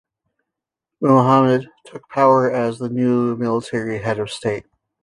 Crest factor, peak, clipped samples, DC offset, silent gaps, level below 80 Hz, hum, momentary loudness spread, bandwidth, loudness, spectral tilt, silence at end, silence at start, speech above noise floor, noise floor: 16 dB; -2 dBFS; under 0.1%; under 0.1%; none; -58 dBFS; none; 11 LU; 11 kHz; -18 LUFS; -7.5 dB/octave; 0.4 s; 1 s; 66 dB; -84 dBFS